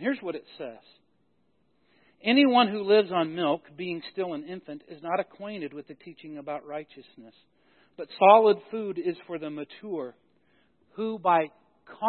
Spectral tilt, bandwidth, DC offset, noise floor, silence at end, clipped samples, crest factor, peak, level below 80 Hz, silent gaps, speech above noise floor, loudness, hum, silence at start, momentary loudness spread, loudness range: -9 dB/octave; 4.4 kHz; under 0.1%; -71 dBFS; 0 s; under 0.1%; 24 dB; -4 dBFS; -80 dBFS; none; 45 dB; -26 LUFS; none; 0 s; 22 LU; 11 LU